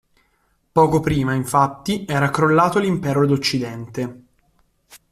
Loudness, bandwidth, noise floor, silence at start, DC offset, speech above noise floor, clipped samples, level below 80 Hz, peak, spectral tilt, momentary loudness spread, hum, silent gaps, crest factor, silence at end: -19 LUFS; 15 kHz; -64 dBFS; 0.75 s; under 0.1%; 46 dB; under 0.1%; -48 dBFS; -2 dBFS; -6 dB/octave; 12 LU; none; none; 18 dB; 0.15 s